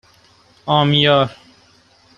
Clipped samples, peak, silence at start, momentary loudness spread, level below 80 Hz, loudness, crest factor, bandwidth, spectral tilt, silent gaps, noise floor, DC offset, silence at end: under 0.1%; -2 dBFS; 0.65 s; 11 LU; -54 dBFS; -15 LUFS; 18 dB; 7 kHz; -7 dB/octave; none; -52 dBFS; under 0.1%; 0.85 s